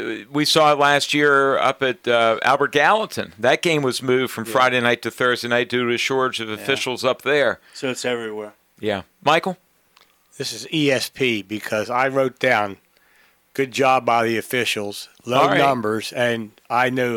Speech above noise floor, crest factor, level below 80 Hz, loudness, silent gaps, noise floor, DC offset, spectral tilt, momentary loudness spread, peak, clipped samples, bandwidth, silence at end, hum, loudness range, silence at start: 38 dB; 18 dB; -66 dBFS; -19 LUFS; none; -57 dBFS; under 0.1%; -4 dB/octave; 11 LU; -2 dBFS; under 0.1%; 18.5 kHz; 0 s; none; 6 LU; 0 s